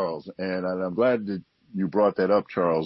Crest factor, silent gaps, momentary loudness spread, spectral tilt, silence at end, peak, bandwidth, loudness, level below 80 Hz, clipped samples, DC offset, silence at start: 14 dB; none; 11 LU; -10 dB/octave; 0 s; -10 dBFS; 5.8 kHz; -25 LUFS; -68 dBFS; under 0.1%; under 0.1%; 0 s